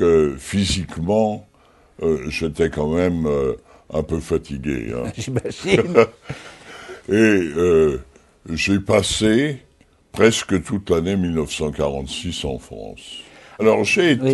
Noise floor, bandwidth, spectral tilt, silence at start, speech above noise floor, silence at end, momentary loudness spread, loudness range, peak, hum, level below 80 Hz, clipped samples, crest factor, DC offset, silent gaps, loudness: -38 dBFS; 12 kHz; -5 dB/octave; 0 s; 19 dB; 0 s; 19 LU; 4 LU; 0 dBFS; none; -40 dBFS; under 0.1%; 20 dB; under 0.1%; none; -20 LUFS